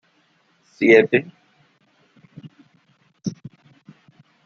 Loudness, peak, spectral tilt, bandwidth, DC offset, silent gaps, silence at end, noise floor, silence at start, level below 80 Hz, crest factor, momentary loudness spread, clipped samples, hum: -18 LUFS; -2 dBFS; -6.5 dB/octave; 6.8 kHz; under 0.1%; none; 1.1 s; -62 dBFS; 0.8 s; -70 dBFS; 22 dB; 27 LU; under 0.1%; none